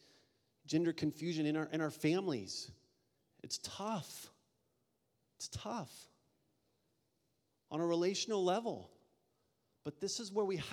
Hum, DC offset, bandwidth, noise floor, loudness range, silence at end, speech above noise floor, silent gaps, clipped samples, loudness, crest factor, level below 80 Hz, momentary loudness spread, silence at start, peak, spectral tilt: none; under 0.1%; 17 kHz; -82 dBFS; 11 LU; 0 s; 44 dB; none; under 0.1%; -39 LUFS; 20 dB; -74 dBFS; 15 LU; 0.65 s; -20 dBFS; -4.5 dB/octave